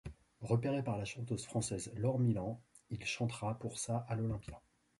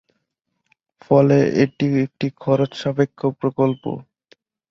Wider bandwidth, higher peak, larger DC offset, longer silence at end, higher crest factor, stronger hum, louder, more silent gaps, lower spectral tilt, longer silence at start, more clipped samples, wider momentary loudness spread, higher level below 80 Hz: first, 11.5 kHz vs 7 kHz; second, -20 dBFS vs -2 dBFS; neither; second, 0.4 s vs 0.7 s; about the same, 18 dB vs 18 dB; neither; second, -38 LUFS vs -19 LUFS; neither; second, -6 dB/octave vs -8 dB/octave; second, 0.05 s vs 1.1 s; neither; first, 15 LU vs 10 LU; about the same, -60 dBFS vs -58 dBFS